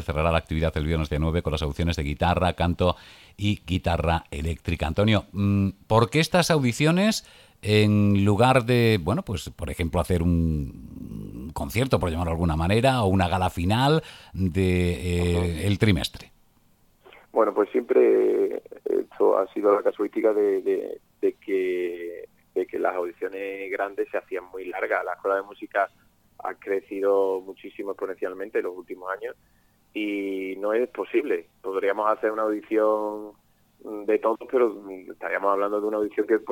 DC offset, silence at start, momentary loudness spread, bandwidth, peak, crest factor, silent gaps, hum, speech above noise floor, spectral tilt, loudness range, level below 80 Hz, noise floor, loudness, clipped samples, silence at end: under 0.1%; 0 s; 13 LU; 17 kHz; -4 dBFS; 20 dB; none; none; 37 dB; -6.5 dB/octave; 7 LU; -40 dBFS; -61 dBFS; -25 LUFS; under 0.1%; 0 s